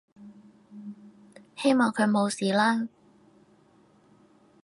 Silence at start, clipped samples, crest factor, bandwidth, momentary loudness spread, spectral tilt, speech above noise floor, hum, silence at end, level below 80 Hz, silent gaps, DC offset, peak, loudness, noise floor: 0.2 s; under 0.1%; 20 dB; 11.5 kHz; 22 LU; -5 dB/octave; 36 dB; none; 1.75 s; -78 dBFS; none; under 0.1%; -10 dBFS; -25 LUFS; -60 dBFS